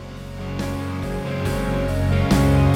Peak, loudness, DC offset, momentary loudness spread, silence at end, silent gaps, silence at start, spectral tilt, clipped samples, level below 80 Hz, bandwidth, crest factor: -6 dBFS; -22 LUFS; under 0.1%; 13 LU; 0 s; none; 0 s; -7 dB/octave; under 0.1%; -30 dBFS; 16.5 kHz; 14 dB